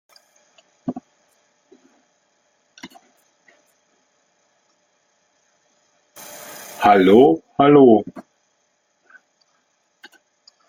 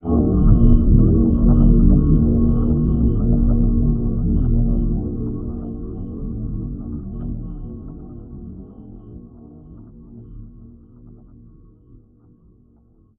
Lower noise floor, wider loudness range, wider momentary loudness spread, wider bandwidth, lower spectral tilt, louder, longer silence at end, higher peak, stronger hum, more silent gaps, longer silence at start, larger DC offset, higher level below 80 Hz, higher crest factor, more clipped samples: first, -67 dBFS vs -53 dBFS; about the same, 24 LU vs 23 LU; about the same, 26 LU vs 24 LU; first, 17 kHz vs 1.5 kHz; second, -6.5 dB/octave vs -14.5 dB/octave; first, -13 LUFS vs -18 LUFS; first, 2.5 s vs 2.05 s; about the same, -2 dBFS vs 0 dBFS; neither; neither; first, 0.85 s vs 0.05 s; neither; second, -62 dBFS vs -20 dBFS; about the same, 20 dB vs 18 dB; neither